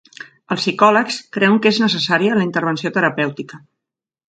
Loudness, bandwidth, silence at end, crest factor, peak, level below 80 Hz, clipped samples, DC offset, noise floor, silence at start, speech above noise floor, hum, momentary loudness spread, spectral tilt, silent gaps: -16 LUFS; 9.2 kHz; 0.75 s; 18 dB; 0 dBFS; -64 dBFS; under 0.1%; under 0.1%; -84 dBFS; 0.2 s; 67 dB; none; 10 LU; -5 dB/octave; none